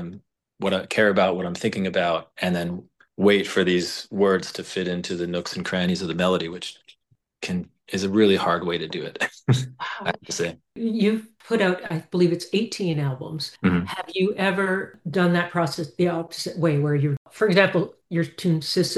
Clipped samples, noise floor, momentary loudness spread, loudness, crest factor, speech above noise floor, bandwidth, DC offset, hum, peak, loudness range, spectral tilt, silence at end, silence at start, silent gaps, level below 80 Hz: under 0.1%; -65 dBFS; 10 LU; -24 LUFS; 20 dB; 42 dB; 12.5 kHz; under 0.1%; none; -4 dBFS; 3 LU; -5.5 dB/octave; 0 s; 0 s; 17.17-17.25 s; -60 dBFS